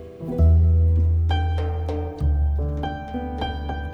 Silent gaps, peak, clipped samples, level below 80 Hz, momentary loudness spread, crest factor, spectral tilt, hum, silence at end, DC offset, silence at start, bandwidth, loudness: none; -8 dBFS; under 0.1%; -24 dBFS; 12 LU; 12 dB; -9 dB/octave; none; 0 s; under 0.1%; 0 s; 4.8 kHz; -22 LUFS